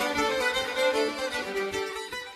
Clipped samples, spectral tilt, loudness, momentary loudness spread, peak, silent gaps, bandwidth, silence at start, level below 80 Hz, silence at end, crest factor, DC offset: under 0.1%; -2 dB/octave; -28 LUFS; 7 LU; -12 dBFS; none; 14 kHz; 0 s; -56 dBFS; 0 s; 16 dB; under 0.1%